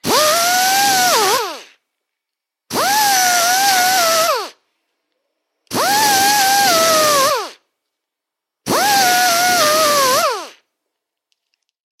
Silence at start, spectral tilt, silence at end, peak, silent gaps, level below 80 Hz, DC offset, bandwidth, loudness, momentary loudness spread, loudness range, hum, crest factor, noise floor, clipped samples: 0.05 s; -0.5 dB/octave; 1.5 s; 0 dBFS; none; -64 dBFS; under 0.1%; 16.5 kHz; -13 LUFS; 11 LU; 1 LU; none; 16 dB; -82 dBFS; under 0.1%